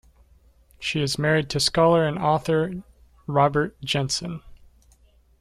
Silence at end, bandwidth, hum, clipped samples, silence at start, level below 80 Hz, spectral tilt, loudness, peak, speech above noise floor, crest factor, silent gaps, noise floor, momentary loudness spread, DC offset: 0.85 s; 14.5 kHz; none; under 0.1%; 0.8 s; -50 dBFS; -4.5 dB/octave; -23 LUFS; -6 dBFS; 35 dB; 18 dB; none; -57 dBFS; 14 LU; under 0.1%